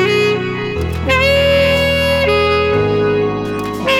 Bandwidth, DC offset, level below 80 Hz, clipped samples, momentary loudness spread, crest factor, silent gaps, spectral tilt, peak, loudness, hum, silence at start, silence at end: 16.5 kHz; under 0.1%; -30 dBFS; under 0.1%; 8 LU; 12 dB; none; -5.5 dB/octave; -2 dBFS; -14 LUFS; none; 0 s; 0 s